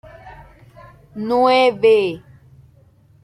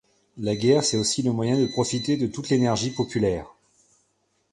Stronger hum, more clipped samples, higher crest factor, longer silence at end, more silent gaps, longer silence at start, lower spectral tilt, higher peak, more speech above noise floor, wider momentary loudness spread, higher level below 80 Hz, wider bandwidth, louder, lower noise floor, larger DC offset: neither; neither; about the same, 16 dB vs 18 dB; about the same, 1.05 s vs 1.05 s; neither; about the same, 0.25 s vs 0.35 s; about the same, -5.5 dB/octave vs -5 dB/octave; first, -4 dBFS vs -8 dBFS; second, 36 dB vs 47 dB; first, 20 LU vs 6 LU; about the same, -54 dBFS vs -52 dBFS; about the same, 11 kHz vs 11.5 kHz; first, -16 LUFS vs -24 LUFS; second, -51 dBFS vs -70 dBFS; neither